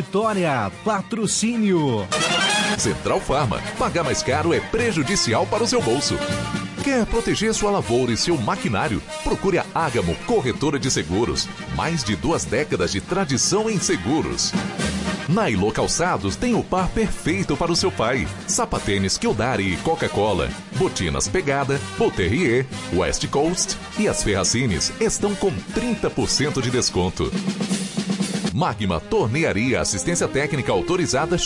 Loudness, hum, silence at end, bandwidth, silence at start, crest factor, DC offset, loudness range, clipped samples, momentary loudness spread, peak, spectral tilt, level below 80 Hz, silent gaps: -21 LUFS; none; 0 s; 11.5 kHz; 0 s; 12 dB; under 0.1%; 2 LU; under 0.1%; 5 LU; -8 dBFS; -4 dB/octave; -38 dBFS; none